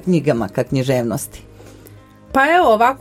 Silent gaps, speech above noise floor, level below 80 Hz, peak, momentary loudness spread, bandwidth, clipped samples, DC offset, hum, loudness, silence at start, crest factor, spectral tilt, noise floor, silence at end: none; 27 dB; -46 dBFS; 0 dBFS; 11 LU; 16.5 kHz; under 0.1%; under 0.1%; none; -16 LUFS; 0.05 s; 18 dB; -6 dB/octave; -42 dBFS; 0.05 s